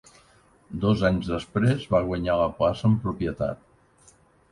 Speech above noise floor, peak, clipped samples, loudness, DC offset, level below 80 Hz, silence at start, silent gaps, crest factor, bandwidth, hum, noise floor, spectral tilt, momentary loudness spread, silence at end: 34 dB; -8 dBFS; under 0.1%; -25 LUFS; under 0.1%; -44 dBFS; 0.7 s; none; 18 dB; 11 kHz; none; -58 dBFS; -8 dB/octave; 8 LU; 0.95 s